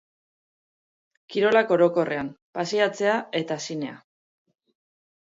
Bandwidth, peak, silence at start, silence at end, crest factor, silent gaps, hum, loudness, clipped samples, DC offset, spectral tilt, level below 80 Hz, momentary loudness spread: 7.8 kHz; -6 dBFS; 1.3 s; 1.4 s; 20 dB; 2.42-2.53 s; none; -24 LUFS; under 0.1%; under 0.1%; -4.5 dB/octave; -70 dBFS; 12 LU